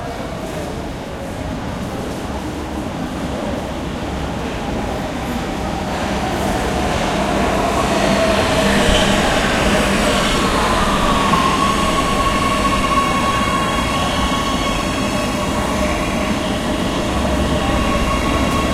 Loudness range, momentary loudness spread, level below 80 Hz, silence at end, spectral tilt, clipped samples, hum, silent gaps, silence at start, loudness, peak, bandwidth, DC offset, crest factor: 9 LU; 10 LU; -28 dBFS; 0 s; -4.5 dB/octave; under 0.1%; none; none; 0 s; -18 LUFS; 0 dBFS; 16.5 kHz; under 0.1%; 16 dB